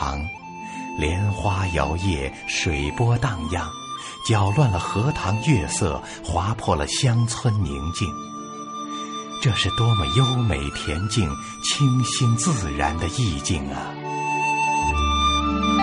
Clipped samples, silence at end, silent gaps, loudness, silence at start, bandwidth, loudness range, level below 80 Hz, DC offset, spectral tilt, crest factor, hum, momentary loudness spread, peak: under 0.1%; 0 s; none; -23 LUFS; 0 s; 11 kHz; 3 LU; -34 dBFS; under 0.1%; -4.5 dB/octave; 16 dB; none; 11 LU; -6 dBFS